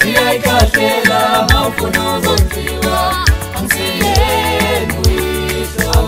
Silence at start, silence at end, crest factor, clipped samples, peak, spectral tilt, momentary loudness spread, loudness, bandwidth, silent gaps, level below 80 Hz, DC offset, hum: 0 s; 0 s; 12 dB; under 0.1%; 0 dBFS; -4 dB/octave; 6 LU; -13 LUFS; 16.5 kHz; none; -20 dBFS; under 0.1%; none